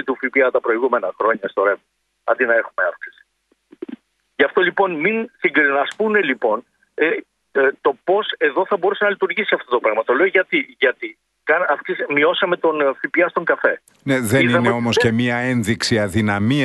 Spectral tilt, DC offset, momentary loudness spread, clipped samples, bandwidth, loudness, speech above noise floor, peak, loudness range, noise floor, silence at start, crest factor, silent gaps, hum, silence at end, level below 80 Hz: -5 dB/octave; under 0.1%; 9 LU; under 0.1%; 12 kHz; -18 LUFS; 46 dB; -2 dBFS; 3 LU; -64 dBFS; 0 s; 18 dB; none; none; 0 s; -56 dBFS